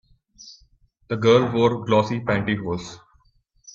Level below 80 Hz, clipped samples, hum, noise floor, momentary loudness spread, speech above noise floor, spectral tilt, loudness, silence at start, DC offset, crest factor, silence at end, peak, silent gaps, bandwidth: -54 dBFS; under 0.1%; none; -62 dBFS; 14 LU; 41 dB; -6.5 dB/octave; -21 LUFS; 0.45 s; under 0.1%; 18 dB; 0.75 s; -4 dBFS; none; 7.6 kHz